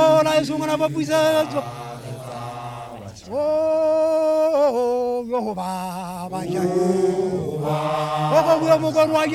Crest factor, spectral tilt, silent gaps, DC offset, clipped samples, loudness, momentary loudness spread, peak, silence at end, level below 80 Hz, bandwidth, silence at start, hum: 16 dB; -5.5 dB/octave; none; under 0.1%; under 0.1%; -20 LUFS; 16 LU; -4 dBFS; 0 s; -56 dBFS; 15.5 kHz; 0 s; none